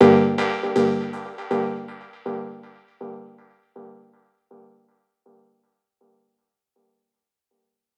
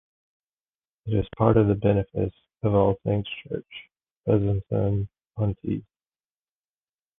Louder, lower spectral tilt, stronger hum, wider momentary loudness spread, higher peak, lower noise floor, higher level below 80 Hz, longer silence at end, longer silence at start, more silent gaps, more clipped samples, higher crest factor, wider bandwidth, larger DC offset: about the same, -23 LUFS vs -25 LUFS; second, -7.5 dB/octave vs -11.5 dB/octave; neither; first, 25 LU vs 14 LU; about the same, -2 dBFS vs -4 dBFS; second, -85 dBFS vs under -90 dBFS; second, -74 dBFS vs -46 dBFS; first, 4.1 s vs 1.35 s; second, 0 s vs 1.05 s; second, none vs 4.11-4.24 s; neither; about the same, 24 dB vs 22 dB; first, 8.8 kHz vs 3.8 kHz; neither